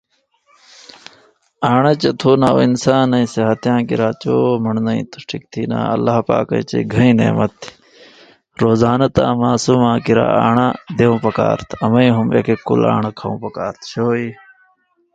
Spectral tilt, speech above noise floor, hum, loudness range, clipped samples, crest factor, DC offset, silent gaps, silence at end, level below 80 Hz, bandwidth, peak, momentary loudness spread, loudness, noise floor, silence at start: -7 dB/octave; 44 dB; none; 3 LU; under 0.1%; 16 dB; under 0.1%; none; 0.8 s; -48 dBFS; 9 kHz; 0 dBFS; 10 LU; -15 LUFS; -59 dBFS; 1.6 s